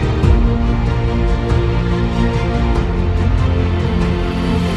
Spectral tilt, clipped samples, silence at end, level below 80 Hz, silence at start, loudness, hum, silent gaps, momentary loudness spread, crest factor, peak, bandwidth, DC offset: -8 dB/octave; under 0.1%; 0 s; -18 dBFS; 0 s; -16 LUFS; none; none; 3 LU; 14 dB; 0 dBFS; 9.8 kHz; under 0.1%